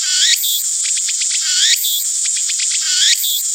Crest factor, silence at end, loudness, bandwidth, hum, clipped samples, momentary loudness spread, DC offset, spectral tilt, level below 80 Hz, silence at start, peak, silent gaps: 16 dB; 0 s; -13 LUFS; 17 kHz; none; under 0.1%; 4 LU; under 0.1%; 13.5 dB/octave; under -90 dBFS; 0 s; 0 dBFS; none